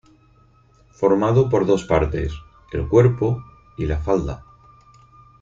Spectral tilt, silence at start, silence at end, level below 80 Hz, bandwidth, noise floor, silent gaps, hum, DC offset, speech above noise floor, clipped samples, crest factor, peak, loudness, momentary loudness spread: -8 dB/octave; 1 s; 1 s; -36 dBFS; 7.8 kHz; -54 dBFS; none; none; under 0.1%; 36 dB; under 0.1%; 20 dB; -2 dBFS; -20 LUFS; 15 LU